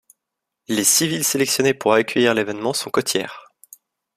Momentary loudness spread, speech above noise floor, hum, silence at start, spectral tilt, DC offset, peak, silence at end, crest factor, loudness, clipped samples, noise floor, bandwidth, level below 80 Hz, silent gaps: 8 LU; 63 dB; none; 0.7 s; -2.5 dB/octave; under 0.1%; -2 dBFS; 0.75 s; 20 dB; -18 LUFS; under 0.1%; -82 dBFS; 15.5 kHz; -64 dBFS; none